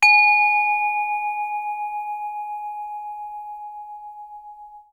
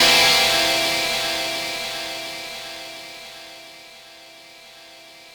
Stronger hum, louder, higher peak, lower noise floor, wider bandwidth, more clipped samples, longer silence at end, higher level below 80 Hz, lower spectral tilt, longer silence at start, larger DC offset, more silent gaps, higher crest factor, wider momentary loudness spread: neither; about the same, -20 LUFS vs -19 LUFS; about the same, -4 dBFS vs -4 dBFS; about the same, -42 dBFS vs -44 dBFS; second, 15.5 kHz vs over 20 kHz; neither; about the same, 0.1 s vs 0.05 s; second, -66 dBFS vs -54 dBFS; second, 3.5 dB/octave vs 0 dB/octave; about the same, 0 s vs 0 s; neither; neither; about the same, 18 dB vs 20 dB; about the same, 24 LU vs 26 LU